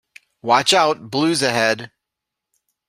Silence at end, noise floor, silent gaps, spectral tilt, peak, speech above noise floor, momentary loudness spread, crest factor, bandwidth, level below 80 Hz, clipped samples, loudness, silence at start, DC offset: 1 s; -83 dBFS; none; -3 dB/octave; -2 dBFS; 65 dB; 8 LU; 20 dB; 15.5 kHz; -64 dBFS; under 0.1%; -17 LUFS; 0.45 s; under 0.1%